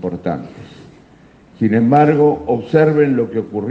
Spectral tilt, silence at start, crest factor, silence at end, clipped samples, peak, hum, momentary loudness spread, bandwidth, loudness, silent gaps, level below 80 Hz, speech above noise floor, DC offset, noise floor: -9.5 dB/octave; 0 s; 16 dB; 0 s; under 0.1%; 0 dBFS; none; 12 LU; 7 kHz; -15 LUFS; none; -54 dBFS; 31 dB; under 0.1%; -46 dBFS